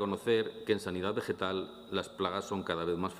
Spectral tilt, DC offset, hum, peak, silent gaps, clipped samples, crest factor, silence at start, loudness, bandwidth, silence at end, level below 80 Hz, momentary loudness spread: -5.5 dB/octave; under 0.1%; none; -14 dBFS; none; under 0.1%; 20 dB; 0 s; -34 LUFS; 15.5 kHz; 0 s; -70 dBFS; 7 LU